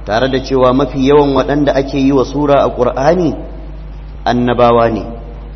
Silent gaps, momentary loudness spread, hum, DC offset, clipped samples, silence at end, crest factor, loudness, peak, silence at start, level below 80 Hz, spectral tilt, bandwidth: none; 19 LU; none; under 0.1%; under 0.1%; 0 s; 12 dB; -12 LUFS; 0 dBFS; 0 s; -28 dBFS; -7 dB/octave; 6.4 kHz